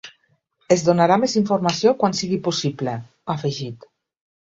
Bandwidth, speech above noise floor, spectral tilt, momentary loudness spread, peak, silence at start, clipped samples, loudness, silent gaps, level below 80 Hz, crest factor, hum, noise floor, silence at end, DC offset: 8 kHz; 45 dB; -5 dB/octave; 12 LU; -2 dBFS; 0.05 s; under 0.1%; -20 LUFS; none; -62 dBFS; 18 dB; none; -65 dBFS; 0.75 s; under 0.1%